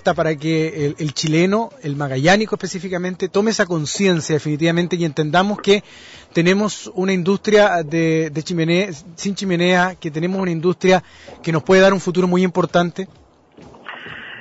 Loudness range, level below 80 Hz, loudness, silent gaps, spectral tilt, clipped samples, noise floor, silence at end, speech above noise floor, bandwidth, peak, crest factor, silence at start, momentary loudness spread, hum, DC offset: 2 LU; -54 dBFS; -18 LUFS; none; -5.5 dB/octave; under 0.1%; -45 dBFS; 0 s; 28 dB; 8 kHz; -4 dBFS; 14 dB; 0.05 s; 10 LU; none; under 0.1%